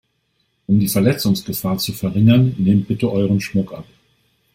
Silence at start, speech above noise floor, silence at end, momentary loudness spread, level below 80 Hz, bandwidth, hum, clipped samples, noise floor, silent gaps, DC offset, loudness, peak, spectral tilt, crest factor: 0.7 s; 50 dB; 0.7 s; 9 LU; -50 dBFS; 16.5 kHz; none; under 0.1%; -67 dBFS; none; under 0.1%; -17 LUFS; -2 dBFS; -6.5 dB/octave; 16 dB